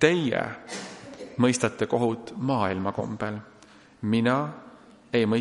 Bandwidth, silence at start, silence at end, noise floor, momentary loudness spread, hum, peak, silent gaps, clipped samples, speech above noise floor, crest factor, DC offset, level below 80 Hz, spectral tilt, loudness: 11.5 kHz; 0 s; 0 s; -53 dBFS; 14 LU; none; -4 dBFS; none; under 0.1%; 28 dB; 22 dB; under 0.1%; -64 dBFS; -5.5 dB/octave; -27 LUFS